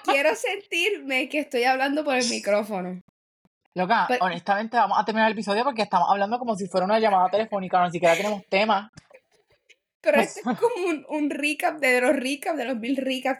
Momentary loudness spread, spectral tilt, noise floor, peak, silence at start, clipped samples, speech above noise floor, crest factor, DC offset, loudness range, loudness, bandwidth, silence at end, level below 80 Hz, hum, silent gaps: 7 LU; -4 dB/octave; -65 dBFS; -6 dBFS; 0.05 s; under 0.1%; 42 dB; 18 dB; under 0.1%; 3 LU; -23 LUFS; 15.5 kHz; 0 s; -76 dBFS; none; 3.01-3.72 s, 8.89-8.93 s, 9.95-10.00 s